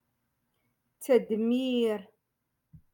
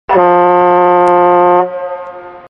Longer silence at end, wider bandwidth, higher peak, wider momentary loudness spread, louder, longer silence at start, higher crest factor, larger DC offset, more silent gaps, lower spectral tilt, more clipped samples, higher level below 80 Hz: about the same, 0.15 s vs 0.1 s; first, 17.5 kHz vs 5.4 kHz; second, -12 dBFS vs 0 dBFS; second, 11 LU vs 15 LU; second, -28 LUFS vs -9 LUFS; first, 1 s vs 0.1 s; first, 20 dB vs 10 dB; neither; neither; second, -5.5 dB/octave vs -8 dB/octave; neither; second, -74 dBFS vs -50 dBFS